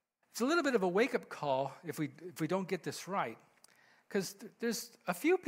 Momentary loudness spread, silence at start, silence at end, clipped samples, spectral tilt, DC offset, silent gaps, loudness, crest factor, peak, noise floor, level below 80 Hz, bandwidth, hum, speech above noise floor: 10 LU; 0.35 s; 0 s; under 0.1%; -4.5 dB/octave; under 0.1%; none; -36 LUFS; 18 dB; -18 dBFS; -66 dBFS; -84 dBFS; 16 kHz; none; 31 dB